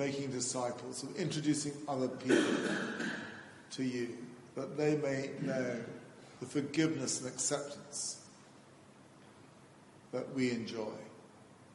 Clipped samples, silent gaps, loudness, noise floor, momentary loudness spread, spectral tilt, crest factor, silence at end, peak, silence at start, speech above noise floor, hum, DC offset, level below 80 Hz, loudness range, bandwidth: under 0.1%; none; -36 LUFS; -59 dBFS; 15 LU; -4 dB/octave; 20 dB; 0 s; -16 dBFS; 0 s; 23 dB; none; under 0.1%; -78 dBFS; 7 LU; 11.5 kHz